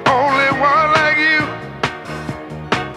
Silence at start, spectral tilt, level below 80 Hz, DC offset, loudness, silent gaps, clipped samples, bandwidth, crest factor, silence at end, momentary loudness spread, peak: 0 s; -4.5 dB/octave; -44 dBFS; under 0.1%; -15 LUFS; none; under 0.1%; 14 kHz; 16 dB; 0 s; 15 LU; 0 dBFS